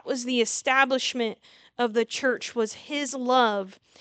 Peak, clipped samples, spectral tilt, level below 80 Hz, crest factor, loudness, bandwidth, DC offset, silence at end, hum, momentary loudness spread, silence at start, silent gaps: -6 dBFS; under 0.1%; -2 dB/octave; -80 dBFS; 20 dB; -25 LUFS; 9.4 kHz; under 0.1%; 0.3 s; none; 10 LU; 0.05 s; none